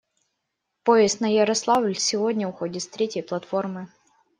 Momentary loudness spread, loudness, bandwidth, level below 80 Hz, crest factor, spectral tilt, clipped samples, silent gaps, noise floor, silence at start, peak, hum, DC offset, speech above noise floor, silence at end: 12 LU; -23 LUFS; 11 kHz; -68 dBFS; 20 dB; -3.5 dB/octave; under 0.1%; none; -80 dBFS; 0.85 s; -4 dBFS; none; under 0.1%; 57 dB; 0.5 s